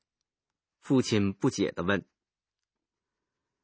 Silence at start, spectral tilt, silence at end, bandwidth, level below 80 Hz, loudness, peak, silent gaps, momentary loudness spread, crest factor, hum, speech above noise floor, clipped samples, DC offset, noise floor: 0.85 s; -5.5 dB/octave; 1.65 s; 8 kHz; -58 dBFS; -28 LUFS; -10 dBFS; none; 5 LU; 22 dB; none; over 63 dB; under 0.1%; under 0.1%; under -90 dBFS